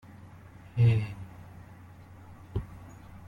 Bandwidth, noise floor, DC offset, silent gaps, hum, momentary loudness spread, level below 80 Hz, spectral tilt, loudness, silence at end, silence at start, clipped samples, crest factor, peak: 4.9 kHz; -50 dBFS; under 0.1%; none; none; 26 LU; -52 dBFS; -8.5 dB/octave; -29 LUFS; 0 s; 0.1 s; under 0.1%; 18 dB; -14 dBFS